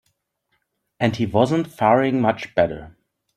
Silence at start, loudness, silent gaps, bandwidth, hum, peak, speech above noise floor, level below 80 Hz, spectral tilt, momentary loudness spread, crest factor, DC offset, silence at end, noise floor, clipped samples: 1 s; -20 LUFS; none; 13.5 kHz; none; -2 dBFS; 53 dB; -54 dBFS; -7 dB/octave; 6 LU; 20 dB; under 0.1%; 0.5 s; -72 dBFS; under 0.1%